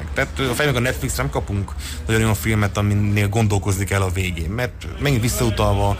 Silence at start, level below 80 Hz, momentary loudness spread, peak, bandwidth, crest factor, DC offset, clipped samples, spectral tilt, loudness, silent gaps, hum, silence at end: 0 s; -30 dBFS; 6 LU; -8 dBFS; 15.5 kHz; 12 dB; under 0.1%; under 0.1%; -5.5 dB/octave; -20 LUFS; none; none; 0 s